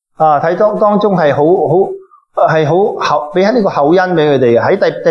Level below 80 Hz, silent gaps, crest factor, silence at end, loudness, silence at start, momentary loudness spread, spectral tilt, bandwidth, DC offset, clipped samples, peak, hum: -56 dBFS; none; 10 dB; 0 s; -11 LUFS; 0.2 s; 4 LU; -7.5 dB/octave; 6.8 kHz; under 0.1%; under 0.1%; 0 dBFS; none